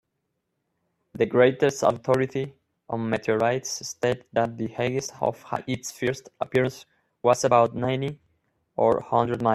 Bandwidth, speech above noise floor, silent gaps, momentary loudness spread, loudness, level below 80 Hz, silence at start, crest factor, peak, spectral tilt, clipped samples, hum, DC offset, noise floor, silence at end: 14 kHz; 54 dB; none; 11 LU; -25 LUFS; -62 dBFS; 1.15 s; 20 dB; -6 dBFS; -5 dB/octave; under 0.1%; none; under 0.1%; -78 dBFS; 0 s